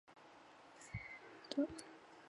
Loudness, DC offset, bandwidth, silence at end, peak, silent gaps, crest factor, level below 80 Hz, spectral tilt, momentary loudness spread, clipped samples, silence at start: -46 LUFS; under 0.1%; 11 kHz; 0 s; -24 dBFS; none; 24 dB; -70 dBFS; -5 dB/octave; 20 LU; under 0.1%; 0.05 s